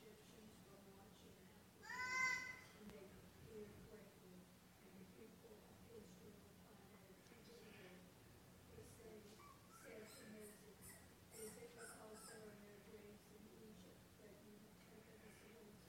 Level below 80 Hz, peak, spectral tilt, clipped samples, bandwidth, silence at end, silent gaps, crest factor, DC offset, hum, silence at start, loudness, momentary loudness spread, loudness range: -78 dBFS; -32 dBFS; -3 dB/octave; under 0.1%; 19 kHz; 0 s; none; 26 dB; under 0.1%; none; 0 s; -56 LUFS; 11 LU; 14 LU